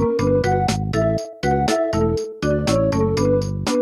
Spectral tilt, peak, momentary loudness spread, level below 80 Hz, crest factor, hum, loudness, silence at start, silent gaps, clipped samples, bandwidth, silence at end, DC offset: -6 dB/octave; -6 dBFS; 4 LU; -36 dBFS; 14 dB; none; -20 LUFS; 0 s; none; under 0.1%; 15 kHz; 0 s; under 0.1%